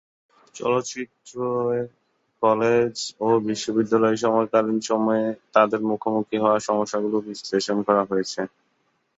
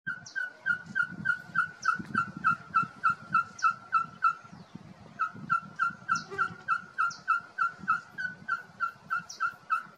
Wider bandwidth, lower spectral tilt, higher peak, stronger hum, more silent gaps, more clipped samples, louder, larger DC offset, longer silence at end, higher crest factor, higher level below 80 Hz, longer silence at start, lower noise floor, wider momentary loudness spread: second, 8 kHz vs 10.5 kHz; first, -5 dB/octave vs -3.5 dB/octave; first, -4 dBFS vs -16 dBFS; neither; neither; neither; first, -23 LUFS vs -31 LUFS; neither; first, 0.7 s vs 0.05 s; about the same, 20 dB vs 16 dB; first, -66 dBFS vs -72 dBFS; first, 0.55 s vs 0.05 s; first, -69 dBFS vs -49 dBFS; about the same, 9 LU vs 8 LU